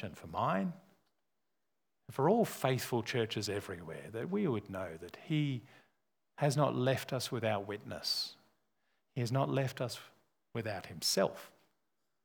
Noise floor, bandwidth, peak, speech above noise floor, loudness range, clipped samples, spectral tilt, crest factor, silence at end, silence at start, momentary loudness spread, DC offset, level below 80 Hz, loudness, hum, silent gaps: -88 dBFS; over 20 kHz; -16 dBFS; 53 dB; 3 LU; under 0.1%; -5 dB/octave; 22 dB; 0.75 s; 0 s; 13 LU; under 0.1%; -74 dBFS; -36 LUFS; none; none